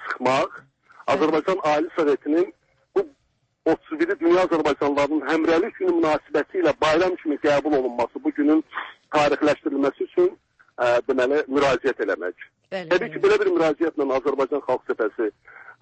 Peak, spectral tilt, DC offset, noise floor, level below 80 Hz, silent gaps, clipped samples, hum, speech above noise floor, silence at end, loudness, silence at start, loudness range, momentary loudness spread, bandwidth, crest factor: -8 dBFS; -5.5 dB/octave; under 0.1%; -69 dBFS; -58 dBFS; none; under 0.1%; none; 48 dB; 0.1 s; -22 LUFS; 0 s; 2 LU; 7 LU; 8.6 kHz; 14 dB